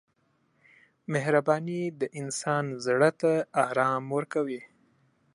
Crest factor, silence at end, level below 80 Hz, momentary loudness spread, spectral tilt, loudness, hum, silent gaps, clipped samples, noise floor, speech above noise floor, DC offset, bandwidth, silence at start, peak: 20 dB; 0.7 s; -80 dBFS; 9 LU; -5.5 dB/octave; -28 LUFS; none; none; under 0.1%; -71 dBFS; 44 dB; under 0.1%; 11.5 kHz; 1.1 s; -8 dBFS